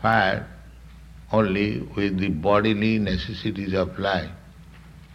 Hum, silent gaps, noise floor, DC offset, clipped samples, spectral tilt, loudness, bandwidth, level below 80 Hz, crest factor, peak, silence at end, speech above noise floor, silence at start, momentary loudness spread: none; none; -45 dBFS; under 0.1%; under 0.1%; -7.5 dB/octave; -24 LUFS; 9.4 kHz; -44 dBFS; 18 dB; -6 dBFS; 0 s; 23 dB; 0 s; 9 LU